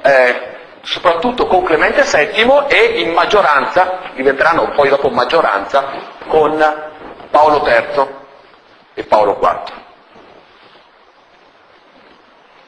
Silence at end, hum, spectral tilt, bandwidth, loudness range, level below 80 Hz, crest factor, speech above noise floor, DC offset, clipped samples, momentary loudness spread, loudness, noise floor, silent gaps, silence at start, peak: 2.9 s; none; -3.5 dB/octave; 11 kHz; 8 LU; -44 dBFS; 14 dB; 34 dB; under 0.1%; under 0.1%; 14 LU; -12 LUFS; -47 dBFS; none; 0 s; 0 dBFS